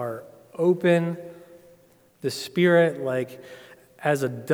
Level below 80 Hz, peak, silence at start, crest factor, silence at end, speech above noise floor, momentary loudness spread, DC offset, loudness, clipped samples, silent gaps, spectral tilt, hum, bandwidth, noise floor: -76 dBFS; -8 dBFS; 0 s; 18 dB; 0 s; 34 dB; 22 LU; under 0.1%; -24 LUFS; under 0.1%; none; -6.5 dB/octave; none; 18.5 kHz; -57 dBFS